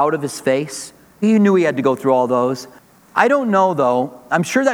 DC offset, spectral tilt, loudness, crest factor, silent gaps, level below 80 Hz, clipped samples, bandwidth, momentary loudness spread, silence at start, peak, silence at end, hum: under 0.1%; -5.5 dB/octave; -17 LUFS; 16 dB; none; -66 dBFS; under 0.1%; 17 kHz; 8 LU; 0 s; 0 dBFS; 0 s; none